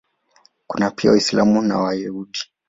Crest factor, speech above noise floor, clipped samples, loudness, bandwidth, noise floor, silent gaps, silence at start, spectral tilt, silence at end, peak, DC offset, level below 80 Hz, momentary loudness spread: 18 dB; 40 dB; under 0.1%; -19 LUFS; 7.8 kHz; -58 dBFS; none; 0.7 s; -5 dB/octave; 0.25 s; -2 dBFS; under 0.1%; -54 dBFS; 13 LU